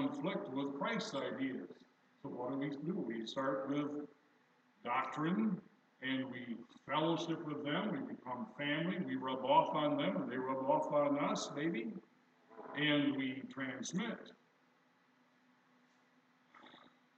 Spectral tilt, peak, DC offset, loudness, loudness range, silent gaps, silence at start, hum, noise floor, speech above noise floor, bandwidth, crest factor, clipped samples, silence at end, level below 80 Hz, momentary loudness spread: -5.5 dB/octave; -18 dBFS; under 0.1%; -38 LUFS; 7 LU; none; 0 s; none; -72 dBFS; 34 dB; 8.4 kHz; 22 dB; under 0.1%; 0.4 s; under -90 dBFS; 13 LU